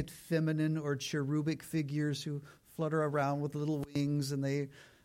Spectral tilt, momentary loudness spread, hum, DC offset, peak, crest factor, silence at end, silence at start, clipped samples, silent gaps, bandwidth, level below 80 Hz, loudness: -6.5 dB/octave; 7 LU; none; under 0.1%; -20 dBFS; 14 dB; 0.2 s; 0 s; under 0.1%; none; 16.5 kHz; -68 dBFS; -35 LUFS